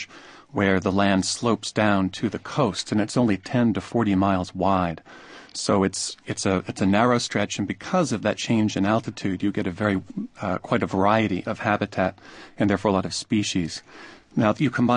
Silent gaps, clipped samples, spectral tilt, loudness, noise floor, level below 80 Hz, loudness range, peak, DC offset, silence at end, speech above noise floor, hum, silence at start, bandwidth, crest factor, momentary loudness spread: none; under 0.1%; -5 dB/octave; -24 LUFS; -42 dBFS; -48 dBFS; 2 LU; -4 dBFS; under 0.1%; 0 s; 19 dB; none; 0 s; 10.5 kHz; 20 dB; 8 LU